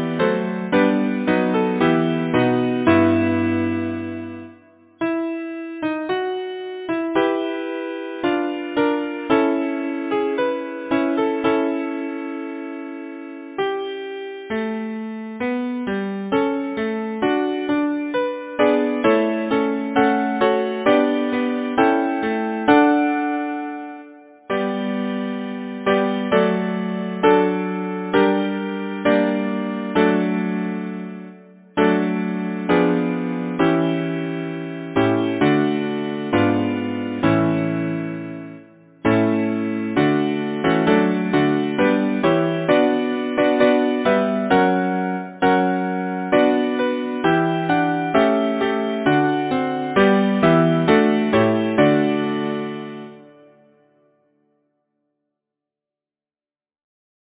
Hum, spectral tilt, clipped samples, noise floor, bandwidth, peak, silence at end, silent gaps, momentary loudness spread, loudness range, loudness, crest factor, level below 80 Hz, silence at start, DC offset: none; -10.5 dB/octave; under 0.1%; under -90 dBFS; 4 kHz; -2 dBFS; 3.95 s; none; 11 LU; 6 LU; -20 LUFS; 18 dB; -54 dBFS; 0 s; under 0.1%